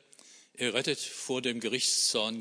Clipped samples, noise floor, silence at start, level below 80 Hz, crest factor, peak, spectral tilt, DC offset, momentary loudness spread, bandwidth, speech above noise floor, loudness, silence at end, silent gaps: under 0.1%; -57 dBFS; 0.25 s; -82 dBFS; 20 dB; -12 dBFS; -1.5 dB/octave; under 0.1%; 9 LU; 11 kHz; 26 dB; -29 LUFS; 0 s; none